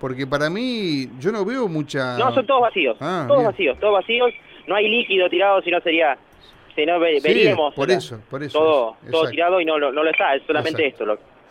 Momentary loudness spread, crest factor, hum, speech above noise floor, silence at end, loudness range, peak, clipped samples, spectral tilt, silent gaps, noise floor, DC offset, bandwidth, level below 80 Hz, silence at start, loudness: 8 LU; 16 dB; none; 26 dB; 0.35 s; 2 LU; -2 dBFS; under 0.1%; -5.5 dB/octave; none; -45 dBFS; under 0.1%; 11.5 kHz; -58 dBFS; 0 s; -19 LUFS